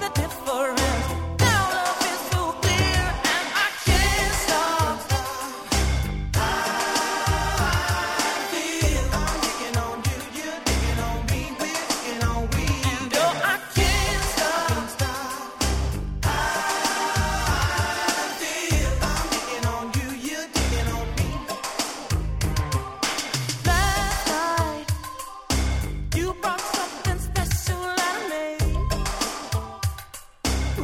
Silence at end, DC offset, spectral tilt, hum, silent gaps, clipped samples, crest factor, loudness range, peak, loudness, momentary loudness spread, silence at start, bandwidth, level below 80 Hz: 0 s; under 0.1%; -3.5 dB/octave; none; none; under 0.1%; 18 dB; 4 LU; -6 dBFS; -24 LUFS; 7 LU; 0 s; 17 kHz; -30 dBFS